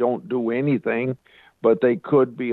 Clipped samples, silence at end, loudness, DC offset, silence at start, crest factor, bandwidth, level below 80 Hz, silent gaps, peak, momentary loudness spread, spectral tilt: under 0.1%; 0 s; -22 LUFS; under 0.1%; 0 s; 16 dB; 4.3 kHz; -68 dBFS; none; -6 dBFS; 7 LU; -10 dB/octave